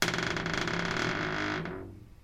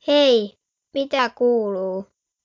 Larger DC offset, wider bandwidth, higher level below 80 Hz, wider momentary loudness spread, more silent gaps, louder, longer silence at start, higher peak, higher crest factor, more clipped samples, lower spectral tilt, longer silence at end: neither; first, 16 kHz vs 7.4 kHz; first, -52 dBFS vs -70 dBFS; second, 11 LU vs 15 LU; neither; second, -32 LUFS vs -20 LUFS; about the same, 0 s vs 0.05 s; second, -12 dBFS vs -6 dBFS; first, 22 dB vs 14 dB; neither; about the same, -4 dB/octave vs -4.5 dB/octave; second, 0.05 s vs 0.4 s